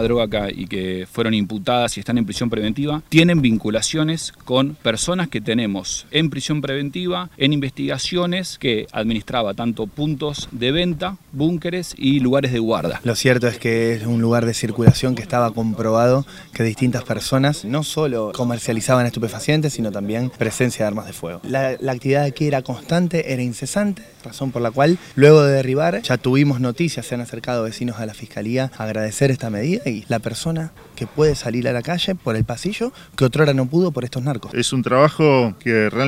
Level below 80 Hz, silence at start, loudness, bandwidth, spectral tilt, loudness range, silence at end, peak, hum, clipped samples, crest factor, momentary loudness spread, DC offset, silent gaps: -44 dBFS; 0 s; -19 LUFS; 16 kHz; -5.5 dB/octave; 5 LU; 0 s; 0 dBFS; none; under 0.1%; 20 dB; 9 LU; under 0.1%; none